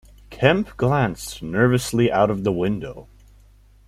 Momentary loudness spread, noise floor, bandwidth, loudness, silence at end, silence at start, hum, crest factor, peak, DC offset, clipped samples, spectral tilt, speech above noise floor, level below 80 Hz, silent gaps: 9 LU; -51 dBFS; 15 kHz; -21 LUFS; 0.85 s; 0.3 s; none; 20 dB; -2 dBFS; under 0.1%; under 0.1%; -6 dB/octave; 31 dB; -44 dBFS; none